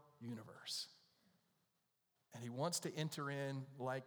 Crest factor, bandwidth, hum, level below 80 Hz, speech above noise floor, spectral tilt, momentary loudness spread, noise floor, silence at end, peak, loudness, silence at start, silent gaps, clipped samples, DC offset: 20 dB; over 20 kHz; none; under -90 dBFS; 40 dB; -4 dB/octave; 11 LU; -86 dBFS; 0 s; -28 dBFS; -46 LUFS; 0 s; none; under 0.1%; under 0.1%